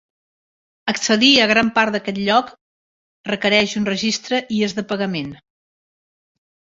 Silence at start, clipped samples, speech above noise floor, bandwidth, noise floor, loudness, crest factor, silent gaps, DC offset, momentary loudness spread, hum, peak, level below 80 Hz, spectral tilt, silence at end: 0.85 s; under 0.1%; over 72 dB; 7.8 kHz; under -90 dBFS; -17 LUFS; 18 dB; 2.61-3.24 s; under 0.1%; 15 LU; none; -2 dBFS; -58 dBFS; -3.5 dB/octave; 1.4 s